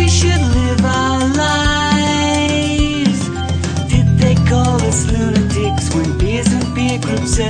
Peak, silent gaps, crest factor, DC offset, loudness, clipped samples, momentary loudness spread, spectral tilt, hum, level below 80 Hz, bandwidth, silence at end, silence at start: -2 dBFS; none; 12 dB; under 0.1%; -15 LUFS; under 0.1%; 5 LU; -5 dB/octave; none; -24 dBFS; 9.8 kHz; 0 s; 0 s